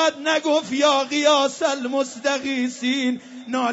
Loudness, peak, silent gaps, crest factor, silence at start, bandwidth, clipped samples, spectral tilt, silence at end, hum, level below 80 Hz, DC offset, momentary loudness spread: -21 LUFS; -6 dBFS; none; 16 dB; 0 s; 8 kHz; under 0.1%; -2 dB/octave; 0 s; none; -74 dBFS; under 0.1%; 7 LU